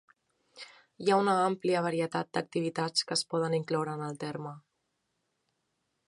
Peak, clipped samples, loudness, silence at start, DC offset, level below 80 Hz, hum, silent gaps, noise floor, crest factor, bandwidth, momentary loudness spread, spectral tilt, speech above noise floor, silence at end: -14 dBFS; under 0.1%; -31 LUFS; 0.55 s; under 0.1%; -80 dBFS; none; none; -80 dBFS; 20 dB; 11.5 kHz; 17 LU; -4.5 dB/octave; 50 dB; 1.5 s